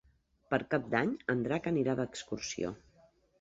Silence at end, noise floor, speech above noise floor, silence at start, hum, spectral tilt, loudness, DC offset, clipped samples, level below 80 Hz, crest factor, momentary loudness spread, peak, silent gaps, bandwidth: 0.65 s; -66 dBFS; 33 dB; 0.5 s; none; -5.5 dB/octave; -34 LUFS; under 0.1%; under 0.1%; -64 dBFS; 22 dB; 7 LU; -14 dBFS; none; 8 kHz